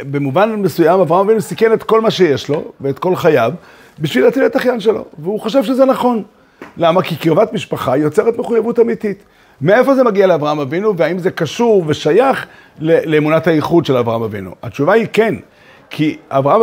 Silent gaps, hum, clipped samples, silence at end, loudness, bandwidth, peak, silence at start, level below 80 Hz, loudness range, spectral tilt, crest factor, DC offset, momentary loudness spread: none; none; under 0.1%; 0 s; -14 LUFS; 16 kHz; 0 dBFS; 0 s; -56 dBFS; 2 LU; -6.5 dB/octave; 14 dB; under 0.1%; 9 LU